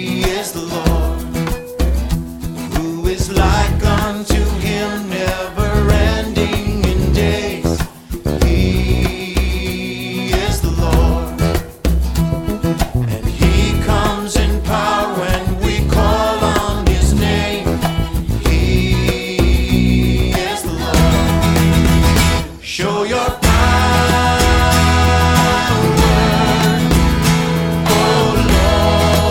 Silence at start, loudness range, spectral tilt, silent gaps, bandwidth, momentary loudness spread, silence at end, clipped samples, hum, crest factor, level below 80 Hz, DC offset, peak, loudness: 0 s; 5 LU; -5.5 dB/octave; none; 18 kHz; 8 LU; 0 s; under 0.1%; none; 14 dB; -20 dBFS; under 0.1%; -2 dBFS; -15 LUFS